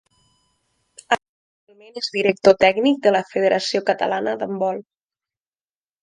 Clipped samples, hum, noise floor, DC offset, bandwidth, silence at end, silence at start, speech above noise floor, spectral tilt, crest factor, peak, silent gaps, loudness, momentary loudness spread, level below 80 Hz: under 0.1%; none; under -90 dBFS; under 0.1%; 10.5 kHz; 1.2 s; 1.1 s; over 71 dB; -4.5 dB/octave; 22 dB; 0 dBFS; 1.29-1.67 s; -19 LUFS; 10 LU; -62 dBFS